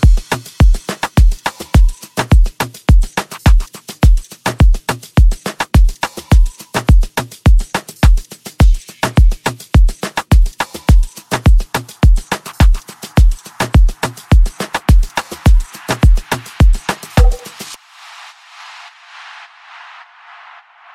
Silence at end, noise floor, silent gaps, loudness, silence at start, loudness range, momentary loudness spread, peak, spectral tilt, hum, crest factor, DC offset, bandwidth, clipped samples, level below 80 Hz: 3.2 s; -40 dBFS; none; -15 LUFS; 0 s; 4 LU; 16 LU; 0 dBFS; -5.5 dB/octave; none; 12 dB; under 0.1%; 15 kHz; under 0.1%; -14 dBFS